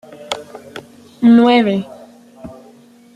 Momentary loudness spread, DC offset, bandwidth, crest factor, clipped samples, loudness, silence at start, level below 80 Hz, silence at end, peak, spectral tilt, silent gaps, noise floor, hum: 27 LU; under 0.1%; 10 kHz; 16 dB; under 0.1%; -14 LUFS; 0.2 s; -58 dBFS; 0.65 s; -2 dBFS; -6 dB/octave; none; -45 dBFS; none